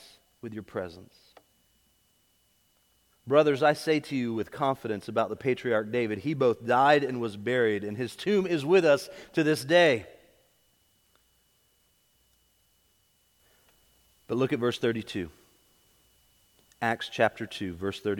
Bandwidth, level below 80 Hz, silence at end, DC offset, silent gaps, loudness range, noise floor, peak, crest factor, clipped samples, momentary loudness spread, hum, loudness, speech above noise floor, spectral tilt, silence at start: 18 kHz; -68 dBFS; 0 s; under 0.1%; none; 8 LU; -68 dBFS; -8 dBFS; 22 dB; under 0.1%; 15 LU; none; -27 LUFS; 42 dB; -5.5 dB/octave; 0.45 s